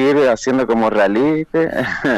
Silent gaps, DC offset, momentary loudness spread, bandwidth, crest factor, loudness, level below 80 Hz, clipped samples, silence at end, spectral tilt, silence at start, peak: none; under 0.1%; 4 LU; 13 kHz; 12 dB; -16 LUFS; -48 dBFS; under 0.1%; 0 s; -5.5 dB/octave; 0 s; -4 dBFS